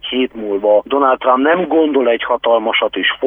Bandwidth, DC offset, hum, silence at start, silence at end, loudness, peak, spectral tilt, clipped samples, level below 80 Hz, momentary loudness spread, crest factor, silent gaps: 3.7 kHz; under 0.1%; none; 0.05 s; 0 s; -14 LUFS; -2 dBFS; -7.5 dB/octave; under 0.1%; -54 dBFS; 5 LU; 12 dB; none